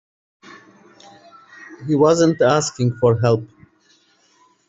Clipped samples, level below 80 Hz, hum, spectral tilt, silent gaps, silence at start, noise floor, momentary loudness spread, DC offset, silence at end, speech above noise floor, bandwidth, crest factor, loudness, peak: under 0.1%; -58 dBFS; none; -6 dB/octave; none; 1.6 s; -58 dBFS; 9 LU; under 0.1%; 1.25 s; 42 dB; 8.2 kHz; 18 dB; -17 LUFS; -2 dBFS